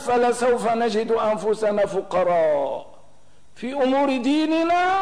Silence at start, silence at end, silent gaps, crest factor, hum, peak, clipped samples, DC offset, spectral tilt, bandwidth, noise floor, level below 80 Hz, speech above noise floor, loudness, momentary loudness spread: 0 s; 0 s; none; 10 dB; none; -12 dBFS; under 0.1%; 0.8%; -5 dB/octave; 11 kHz; -57 dBFS; -58 dBFS; 36 dB; -21 LUFS; 5 LU